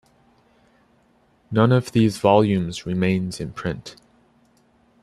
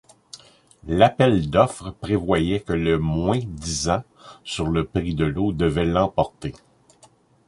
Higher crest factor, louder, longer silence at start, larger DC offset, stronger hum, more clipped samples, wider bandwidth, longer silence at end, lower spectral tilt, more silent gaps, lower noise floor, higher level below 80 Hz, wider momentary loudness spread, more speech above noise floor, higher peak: about the same, 20 dB vs 22 dB; about the same, -21 LUFS vs -22 LUFS; first, 1.5 s vs 0.35 s; neither; neither; neither; first, 13 kHz vs 11.5 kHz; first, 1.1 s vs 0.9 s; about the same, -7 dB/octave vs -6 dB/octave; neither; first, -60 dBFS vs -55 dBFS; second, -54 dBFS vs -38 dBFS; second, 13 LU vs 16 LU; first, 40 dB vs 34 dB; about the same, -2 dBFS vs -2 dBFS